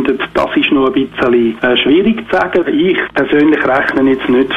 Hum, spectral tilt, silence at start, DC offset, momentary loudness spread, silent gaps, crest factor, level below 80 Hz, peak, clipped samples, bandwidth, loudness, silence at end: none; -6.5 dB/octave; 0 s; under 0.1%; 4 LU; none; 10 dB; -42 dBFS; 0 dBFS; under 0.1%; 7.4 kHz; -12 LUFS; 0 s